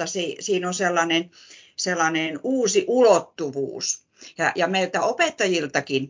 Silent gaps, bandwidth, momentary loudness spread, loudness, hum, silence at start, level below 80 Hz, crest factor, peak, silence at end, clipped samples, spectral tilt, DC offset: none; 7.8 kHz; 10 LU; -22 LUFS; none; 0 s; -72 dBFS; 18 dB; -4 dBFS; 0 s; under 0.1%; -3 dB/octave; under 0.1%